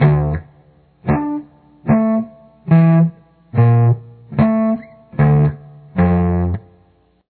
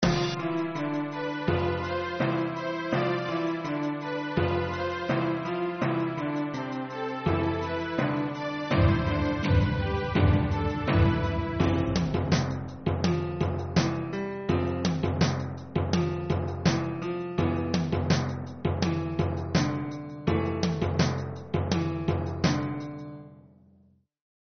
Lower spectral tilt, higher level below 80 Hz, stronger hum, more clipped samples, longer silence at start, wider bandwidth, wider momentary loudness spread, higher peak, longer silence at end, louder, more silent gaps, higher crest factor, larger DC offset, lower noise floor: first, -13.5 dB/octave vs -6 dB/octave; first, -36 dBFS vs -42 dBFS; neither; neither; about the same, 0 s vs 0 s; second, 4.4 kHz vs 6.6 kHz; first, 15 LU vs 7 LU; first, 0 dBFS vs -10 dBFS; second, 0.7 s vs 1.15 s; first, -16 LUFS vs -28 LUFS; neither; about the same, 16 dB vs 18 dB; neither; second, -55 dBFS vs -62 dBFS